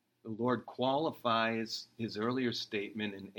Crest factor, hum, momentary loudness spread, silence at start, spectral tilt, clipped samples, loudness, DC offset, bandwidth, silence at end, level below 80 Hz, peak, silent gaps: 18 dB; none; 8 LU; 0.25 s; -5 dB/octave; under 0.1%; -35 LUFS; under 0.1%; 17 kHz; 0 s; -80 dBFS; -16 dBFS; none